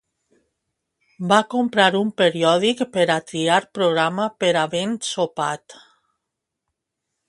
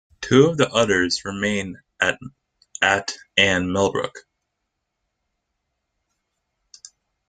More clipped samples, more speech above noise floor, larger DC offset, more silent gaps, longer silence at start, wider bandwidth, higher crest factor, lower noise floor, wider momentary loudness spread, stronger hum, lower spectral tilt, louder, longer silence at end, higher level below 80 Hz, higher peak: neither; first, 62 dB vs 58 dB; neither; neither; first, 1.2 s vs 0.2 s; first, 11.5 kHz vs 9.6 kHz; about the same, 20 dB vs 22 dB; first, -82 dBFS vs -78 dBFS; second, 7 LU vs 12 LU; neither; about the same, -4 dB/octave vs -4 dB/octave; about the same, -20 LUFS vs -20 LUFS; second, 1.55 s vs 3.1 s; second, -68 dBFS vs -56 dBFS; about the same, 0 dBFS vs -2 dBFS